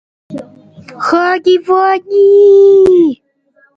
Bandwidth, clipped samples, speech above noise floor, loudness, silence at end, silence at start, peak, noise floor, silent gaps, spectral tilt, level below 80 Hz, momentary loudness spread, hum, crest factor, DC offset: 7.4 kHz; under 0.1%; 45 dB; -8 LUFS; 0.65 s; 0.3 s; 0 dBFS; -53 dBFS; none; -5.5 dB/octave; -52 dBFS; 23 LU; none; 10 dB; under 0.1%